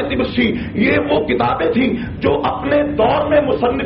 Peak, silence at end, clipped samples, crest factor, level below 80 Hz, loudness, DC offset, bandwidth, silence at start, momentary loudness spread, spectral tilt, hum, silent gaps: -4 dBFS; 0 s; under 0.1%; 12 dB; -36 dBFS; -16 LUFS; under 0.1%; 5.8 kHz; 0 s; 4 LU; -4.5 dB/octave; none; none